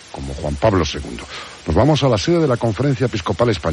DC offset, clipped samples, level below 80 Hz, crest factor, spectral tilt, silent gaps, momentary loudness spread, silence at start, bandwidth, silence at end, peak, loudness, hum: under 0.1%; under 0.1%; -34 dBFS; 16 dB; -6 dB/octave; none; 14 LU; 0 s; 11.5 kHz; 0 s; -2 dBFS; -18 LUFS; none